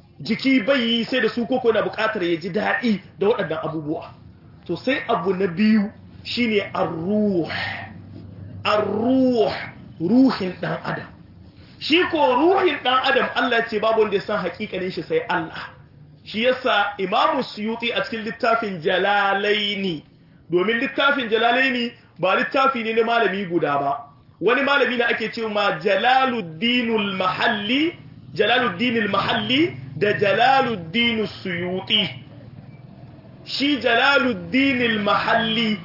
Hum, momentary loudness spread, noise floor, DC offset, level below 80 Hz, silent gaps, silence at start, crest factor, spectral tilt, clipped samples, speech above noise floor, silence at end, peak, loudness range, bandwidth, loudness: none; 10 LU; -46 dBFS; under 0.1%; -60 dBFS; none; 0.2 s; 16 dB; -6 dB/octave; under 0.1%; 26 dB; 0 s; -6 dBFS; 3 LU; 5.8 kHz; -20 LUFS